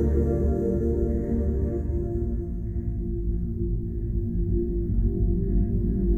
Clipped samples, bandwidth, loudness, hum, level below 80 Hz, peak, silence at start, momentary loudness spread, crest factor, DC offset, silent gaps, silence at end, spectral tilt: under 0.1%; 2.1 kHz; -27 LUFS; none; -28 dBFS; -12 dBFS; 0 s; 6 LU; 12 dB; under 0.1%; none; 0 s; -12.5 dB/octave